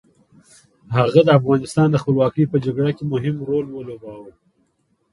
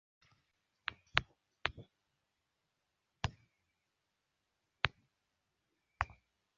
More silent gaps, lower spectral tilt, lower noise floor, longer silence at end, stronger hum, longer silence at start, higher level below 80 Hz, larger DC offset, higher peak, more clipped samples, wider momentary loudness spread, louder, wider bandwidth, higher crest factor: neither; first, -8 dB/octave vs -1 dB/octave; second, -66 dBFS vs -85 dBFS; first, 0.85 s vs 0.5 s; neither; about the same, 0.9 s vs 0.9 s; first, -54 dBFS vs -60 dBFS; neither; first, 0 dBFS vs -8 dBFS; neither; first, 17 LU vs 9 LU; first, -18 LUFS vs -40 LUFS; first, 11.5 kHz vs 7.2 kHz; second, 18 dB vs 38 dB